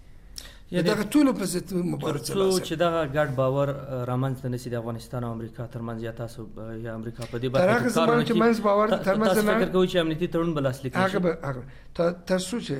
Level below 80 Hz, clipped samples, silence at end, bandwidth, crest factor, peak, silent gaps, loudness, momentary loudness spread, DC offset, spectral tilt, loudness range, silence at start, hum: -48 dBFS; under 0.1%; 0 s; 16 kHz; 16 dB; -8 dBFS; none; -25 LUFS; 14 LU; under 0.1%; -6 dB/octave; 9 LU; 0.1 s; none